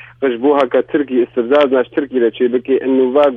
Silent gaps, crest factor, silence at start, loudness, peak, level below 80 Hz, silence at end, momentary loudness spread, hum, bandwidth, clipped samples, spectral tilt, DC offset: none; 14 dB; 0.2 s; -14 LUFS; 0 dBFS; -58 dBFS; 0 s; 4 LU; none; 5.4 kHz; under 0.1%; -7 dB/octave; under 0.1%